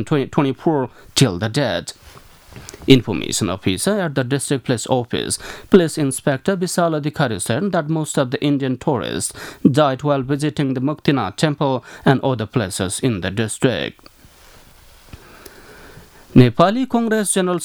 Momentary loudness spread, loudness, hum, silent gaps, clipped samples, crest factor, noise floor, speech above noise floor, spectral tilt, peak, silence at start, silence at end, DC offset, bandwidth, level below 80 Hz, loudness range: 8 LU; -19 LUFS; none; none; under 0.1%; 18 dB; -46 dBFS; 28 dB; -5 dB/octave; 0 dBFS; 0 s; 0 s; under 0.1%; 19.5 kHz; -48 dBFS; 3 LU